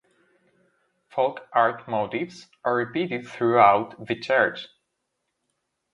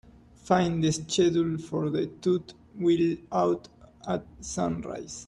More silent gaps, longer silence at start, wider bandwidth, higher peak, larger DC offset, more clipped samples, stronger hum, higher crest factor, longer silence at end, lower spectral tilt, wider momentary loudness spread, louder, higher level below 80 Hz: neither; first, 1.15 s vs 0.45 s; about the same, 10.5 kHz vs 11 kHz; first, -2 dBFS vs -8 dBFS; neither; neither; neither; about the same, 24 dB vs 20 dB; first, 1.25 s vs 0.05 s; about the same, -6 dB/octave vs -5.5 dB/octave; first, 14 LU vs 10 LU; first, -24 LUFS vs -28 LUFS; second, -70 dBFS vs -56 dBFS